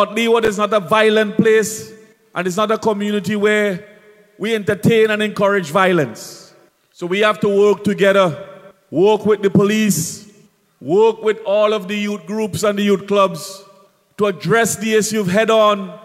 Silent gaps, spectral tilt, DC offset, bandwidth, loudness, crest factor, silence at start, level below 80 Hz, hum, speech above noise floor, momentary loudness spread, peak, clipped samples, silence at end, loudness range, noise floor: none; -4.5 dB/octave; under 0.1%; 15.5 kHz; -16 LUFS; 16 dB; 0 s; -60 dBFS; none; 36 dB; 11 LU; 0 dBFS; under 0.1%; 0.1 s; 3 LU; -52 dBFS